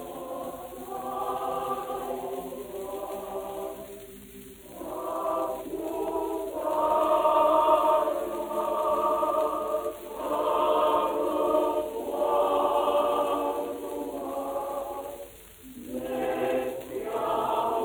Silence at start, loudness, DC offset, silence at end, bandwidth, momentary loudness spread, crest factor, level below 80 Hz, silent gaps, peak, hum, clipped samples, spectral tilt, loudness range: 0 s; -28 LUFS; under 0.1%; 0 s; over 20 kHz; 15 LU; 18 dB; -58 dBFS; none; -10 dBFS; none; under 0.1%; -4.5 dB/octave; 10 LU